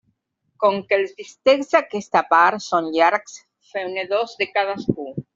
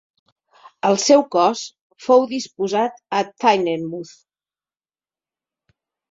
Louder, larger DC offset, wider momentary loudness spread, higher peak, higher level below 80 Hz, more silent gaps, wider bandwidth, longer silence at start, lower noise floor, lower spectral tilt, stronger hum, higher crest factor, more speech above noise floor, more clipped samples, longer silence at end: about the same, -20 LUFS vs -19 LUFS; neither; second, 12 LU vs 16 LU; about the same, -2 dBFS vs -2 dBFS; about the same, -64 dBFS vs -68 dBFS; second, none vs 1.81-1.90 s; about the same, 7.8 kHz vs 7.8 kHz; second, 0.6 s vs 0.85 s; second, -69 dBFS vs under -90 dBFS; about the same, -4.5 dB/octave vs -4 dB/octave; neither; about the same, 18 dB vs 20 dB; second, 50 dB vs over 72 dB; neither; second, 0.15 s vs 2.05 s